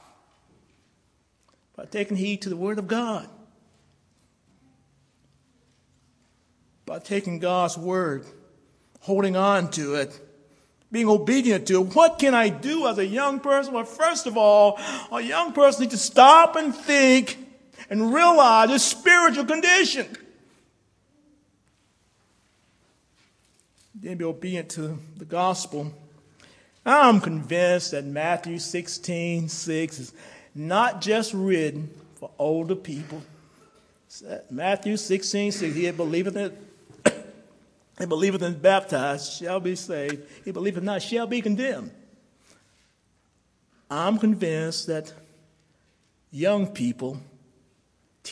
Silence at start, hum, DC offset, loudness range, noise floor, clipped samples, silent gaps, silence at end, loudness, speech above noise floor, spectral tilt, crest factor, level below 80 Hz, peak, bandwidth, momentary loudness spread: 1.8 s; none; under 0.1%; 13 LU; -67 dBFS; under 0.1%; none; 0 s; -22 LUFS; 45 dB; -4 dB/octave; 24 dB; -70 dBFS; 0 dBFS; 11 kHz; 19 LU